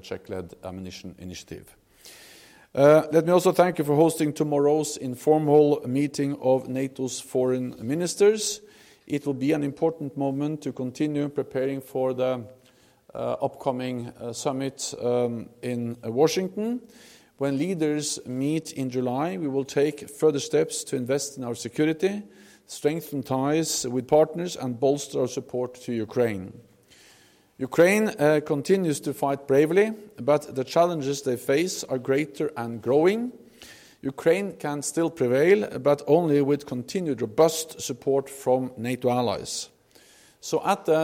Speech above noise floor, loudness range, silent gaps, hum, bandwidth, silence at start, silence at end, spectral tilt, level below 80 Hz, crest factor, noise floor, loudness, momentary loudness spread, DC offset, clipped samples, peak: 34 dB; 6 LU; none; none; 16.5 kHz; 0.05 s; 0 s; -5 dB/octave; -66 dBFS; 18 dB; -59 dBFS; -25 LUFS; 12 LU; under 0.1%; under 0.1%; -6 dBFS